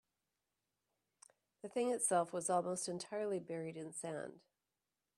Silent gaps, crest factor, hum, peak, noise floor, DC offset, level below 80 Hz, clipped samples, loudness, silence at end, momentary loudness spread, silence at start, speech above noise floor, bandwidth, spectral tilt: none; 20 dB; none; -22 dBFS; under -90 dBFS; under 0.1%; -88 dBFS; under 0.1%; -40 LUFS; 0.8 s; 11 LU; 1.65 s; over 50 dB; 14.5 kHz; -4 dB/octave